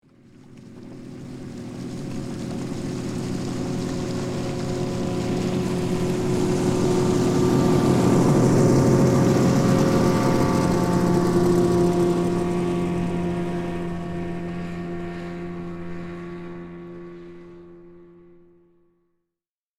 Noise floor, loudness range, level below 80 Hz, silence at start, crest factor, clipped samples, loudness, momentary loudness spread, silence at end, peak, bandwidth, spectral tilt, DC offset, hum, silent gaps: -89 dBFS; 16 LU; -46 dBFS; 0.5 s; 16 dB; under 0.1%; -22 LUFS; 19 LU; 1.75 s; -6 dBFS; 15 kHz; -7 dB/octave; under 0.1%; none; none